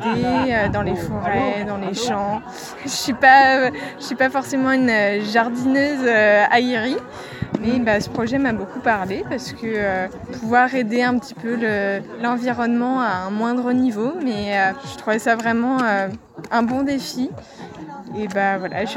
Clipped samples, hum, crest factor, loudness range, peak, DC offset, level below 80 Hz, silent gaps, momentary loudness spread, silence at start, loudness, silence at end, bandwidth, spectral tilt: under 0.1%; none; 20 dB; 5 LU; 0 dBFS; under 0.1%; -48 dBFS; none; 12 LU; 0 s; -19 LUFS; 0 s; 16.5 kHz; -5 dB/octave